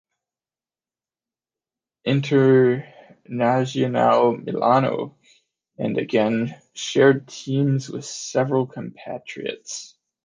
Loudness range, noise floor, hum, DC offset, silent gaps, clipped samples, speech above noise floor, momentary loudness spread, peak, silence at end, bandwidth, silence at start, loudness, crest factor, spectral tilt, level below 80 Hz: 3 LU; under -90 dBFS; none; under 0.1%; none; under 0.1%; over 69 dB; 16 LU; -4 dBFS; 0.4 s; 9.8 kHz; 2.05 s; -21 LUFS; 20 dB; -6 dB/octave; -68 dBFS